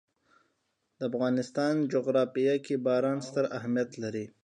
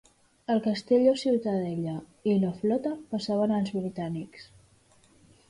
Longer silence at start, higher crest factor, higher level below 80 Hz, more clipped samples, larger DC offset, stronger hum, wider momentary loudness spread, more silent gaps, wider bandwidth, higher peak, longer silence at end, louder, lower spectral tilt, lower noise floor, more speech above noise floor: first, 1 s vs 0.5 s; about the same, 16 dB vs 18 dB; second, -78 dBFS vs -66 dBFS; neither; neither; neither; second, 7 LU vs 12 LU; neither; about the same, 11 kHz vs 11 kHz; about the same, -14 dBFS vs -12 dBFS; second, 0.15 s vs 1.05 s; about the same, -30 LUFS vs -28 LUFS; about the same, -6.5 dB/octave vs -7.5 dB/octave; first, -78 dBFS vs -61 dBFS; first, 49 dB vs 34 dB